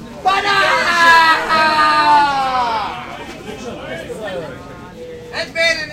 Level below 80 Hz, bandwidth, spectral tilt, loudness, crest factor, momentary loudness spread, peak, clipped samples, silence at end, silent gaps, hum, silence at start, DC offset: -46 dBFS; 16 kHz; -2.5 dB/octave; -13 LUFS; 16 dB; 20 LU; 0 dBFS; under 0.1%; 0 s; none; none; 0 s; under 0.1%